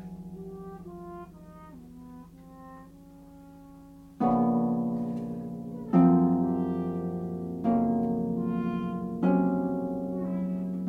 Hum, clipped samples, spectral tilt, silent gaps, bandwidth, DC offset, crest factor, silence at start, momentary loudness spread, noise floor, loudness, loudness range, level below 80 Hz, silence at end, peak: none; under 0.1%; -10.5 dB/octave; none; 3.7 kHz; under 0.1%; 18 dB; 0 s; 23 LU; -50 dBFS; -28 LUFS; 19 LU; -58 dBFS; 0 s; -10 dBFS